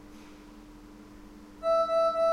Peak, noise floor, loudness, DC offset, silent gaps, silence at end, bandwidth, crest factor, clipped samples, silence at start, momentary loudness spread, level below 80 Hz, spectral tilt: -18 dBFS; -49 dBFS; -27 LUFS; under 0.1%; none; 0 s; 12 kHz; 14 dB; under 0.1%; 0.05 s; 25 LU; -56 dBFS; -4.5 dB/octave